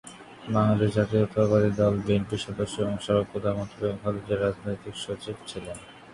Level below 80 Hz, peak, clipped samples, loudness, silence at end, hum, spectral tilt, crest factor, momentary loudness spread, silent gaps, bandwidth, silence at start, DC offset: -50 dBFS; -8 dBFS; under 0.1%; -27 LUFS; 0 s; none; -7 dB/octave; 18 dB; 14 LU; none; 11.5 kHz; 0.05 s; under 0.1%